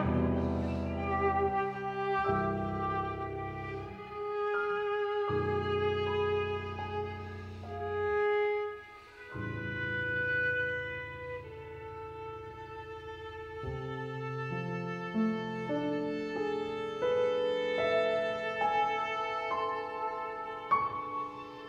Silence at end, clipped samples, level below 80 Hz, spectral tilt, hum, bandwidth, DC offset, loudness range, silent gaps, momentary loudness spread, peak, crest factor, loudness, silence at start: 0 s; under 0.1%; -54 dBFS; -7 dB/octave; none; 8 kHz; under 0.1%; 6 LU; none; 13 LU; -16 dBFS; 18 dB; -34 LUFS; 0 s